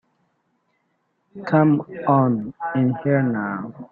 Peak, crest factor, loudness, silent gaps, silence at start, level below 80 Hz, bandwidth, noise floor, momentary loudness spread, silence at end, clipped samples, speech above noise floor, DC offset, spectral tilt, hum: -4 dBFS; 18 dB; -21 LUFS; none; 1.35 s; -64 dBFS; 5 kHz; -70 dBFS; 10 LU; 0.05 s; under 0.1%; 50 dB; under 0.1%; -11 dB/octave; none